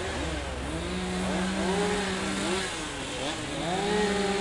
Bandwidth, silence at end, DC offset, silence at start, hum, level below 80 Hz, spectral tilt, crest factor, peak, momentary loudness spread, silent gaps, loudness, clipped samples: 11.5 kHz; 0 s; under 0.1%; 0 s; none; -44 dBFS; -4 dB/octave; 14 dB; -14 dBFS; 6 LU; none; -29 LUFS; under 0.1%